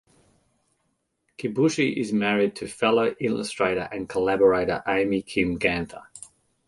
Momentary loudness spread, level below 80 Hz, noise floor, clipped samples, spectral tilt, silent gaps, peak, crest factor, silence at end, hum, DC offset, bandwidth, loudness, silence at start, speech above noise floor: 10 LU; -54 dBFS; -74 dBFS; under 0.1%; -5.5 dB/octave; none; -6 dBFS; 20 dB; 0.5 s; none; under 0.1%; 11.5 kHz; -24 LUFS; 1.4 s; 50 dB